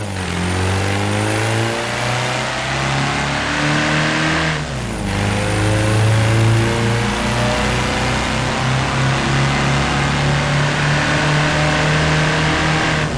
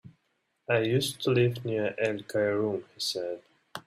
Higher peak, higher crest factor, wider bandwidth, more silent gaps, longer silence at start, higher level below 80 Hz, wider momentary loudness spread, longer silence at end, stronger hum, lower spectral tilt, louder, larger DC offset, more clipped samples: about the same, -8 dBFS vs -10 dBFS; second, 8 dB vs 18 dB; second, 11 kHz vs 15.5 kHz; neither; about the same, 0 s vs 0.05 s; first, -32 dBFS vs -68 dBFS; second, 4 LU vs 12 LU; about the same, 0 s vs 0.05 s; neither; about the same, -4.5 dB/octave vs -5 dB/octave; first, -17 LUFS vs -29 LUFS; neither; neither